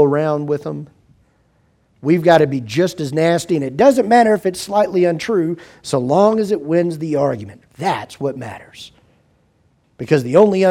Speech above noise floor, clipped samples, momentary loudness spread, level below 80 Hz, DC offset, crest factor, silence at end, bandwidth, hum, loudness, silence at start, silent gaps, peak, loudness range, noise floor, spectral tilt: 43 dB; under 0.1%; 16 LU; -58 dBFS; under 0.1%; 16 dB; 0 s; 15.5 kHz; none; -16 LUFS; 0 s; none; 0 dBFS; 7 LU; -59 dBFS; -6.5 dB/octave